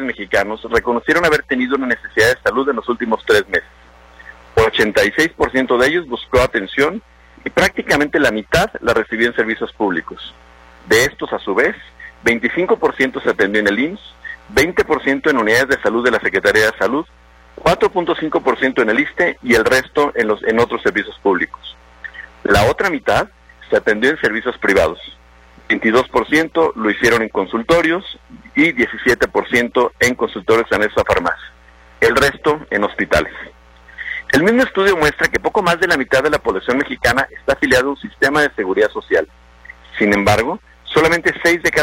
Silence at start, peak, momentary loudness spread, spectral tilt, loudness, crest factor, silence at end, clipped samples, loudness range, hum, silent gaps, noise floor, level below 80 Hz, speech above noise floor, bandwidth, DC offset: 0 s; 0 dBFS; 9 LU; -4.5 dB/octave; -16 LUFS; 16 dB; 0 s; under 0.1%; 2 LU; none; none; -45 dBFS; -40 dBFS; 29 dB; 16.5 kHz; under 0.1%